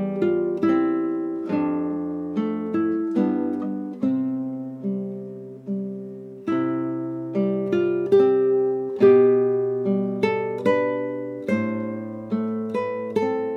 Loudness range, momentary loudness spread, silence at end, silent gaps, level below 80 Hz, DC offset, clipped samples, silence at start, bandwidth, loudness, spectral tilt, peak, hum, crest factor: 8 LU; 12 LU; 0 s; none; -70 dBFS; under 0.1%; under 0.1%; 0 s; 6.4 kHz; -23 LUFS; -9 dB/octave; -6 dBFS; none; 16 dB